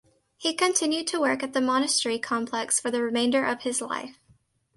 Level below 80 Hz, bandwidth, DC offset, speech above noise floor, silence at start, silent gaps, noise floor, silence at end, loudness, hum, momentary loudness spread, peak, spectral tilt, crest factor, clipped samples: -70 dBFS; 11.5 kHz; under 0.1%; 37 dB; 0.4 s; none; -63 dBFS; 0.65 s; -25 LUFS; none; 6 LU; -8 dBFS; -1.5 dB/octave; 20 dB; under 0.1%